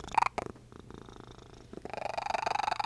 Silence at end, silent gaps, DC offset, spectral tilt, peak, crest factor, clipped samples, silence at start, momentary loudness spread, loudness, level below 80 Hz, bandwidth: 0 s; none; under 0.1%; -3.5 dB/octave; -12 dBFS; 24 dB; under 0.1%; 0 s; 20 LU; -34 LUFS; -58 dBFS; 11 kHz